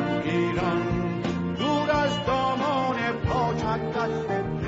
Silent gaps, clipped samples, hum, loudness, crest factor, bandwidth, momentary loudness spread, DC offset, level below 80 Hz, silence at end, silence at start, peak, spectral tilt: none; under 0.1%; none; -26 LUFS; 12 dB; 8 kHz; 4 LU; under 0.1%; -44 dBFS; 0 s; 0 s; -14 dBFS; -6.5 dB/octave